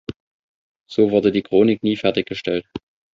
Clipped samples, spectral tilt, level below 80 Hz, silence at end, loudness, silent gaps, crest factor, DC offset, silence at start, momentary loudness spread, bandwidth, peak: under 0.1%; -7 dB/octave; -54 dBFS; 0.35 s; -19 LUFS; 0.16-0.80 s; 18 dB; under 0.1%; 0.1 s; 18 LU; 7.4 kHz; -2 dBFS